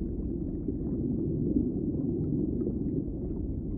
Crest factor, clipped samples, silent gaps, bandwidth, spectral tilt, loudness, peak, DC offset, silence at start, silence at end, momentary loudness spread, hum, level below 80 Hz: 16 dB; under 0.1%; none; 1.7 kHz; -17 dB/octave; -32 LUFS; -14 dBFS; under 0.1%; 0 s; 0 s; 5 LU; none; -40 dBFS